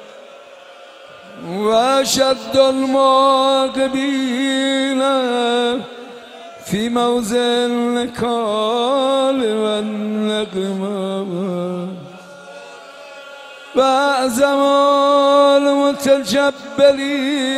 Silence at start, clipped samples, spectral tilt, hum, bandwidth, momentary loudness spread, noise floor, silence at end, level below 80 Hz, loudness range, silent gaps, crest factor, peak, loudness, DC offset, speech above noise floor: 0 s; under 0.1%; -4 dB/octave; none; 14.5 kHz; 22 LU; -40 dBFS; 0 s; -58 dBFS; 8 LU; none; 16 dB; -2 dBFS; -16 LUFS; under 0.1%; 24 dB